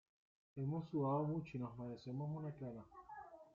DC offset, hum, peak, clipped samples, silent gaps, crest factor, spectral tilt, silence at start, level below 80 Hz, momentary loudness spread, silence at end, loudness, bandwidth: under 0.1%; none; -28 dBFS; under 0.1%; none; 16 dB; -9 dB/octave; 0.55 s; -76 dBFS; 17 LU; 0.05 s; -44 LUFS; 7 kHz